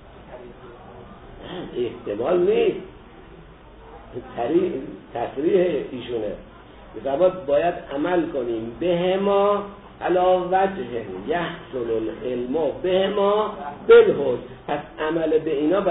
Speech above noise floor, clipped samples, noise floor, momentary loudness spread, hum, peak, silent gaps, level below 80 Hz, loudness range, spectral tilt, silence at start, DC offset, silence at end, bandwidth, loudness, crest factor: 23 dB; under 0.1%; -45 dBFS; 19 LU; none; -4 dBFS; none; -50 dBFS; 6 LU; -10.5 dB/octave; 0 s; under 0.1%; 0 s; 4 kHz; -22 LUFS; 18 dB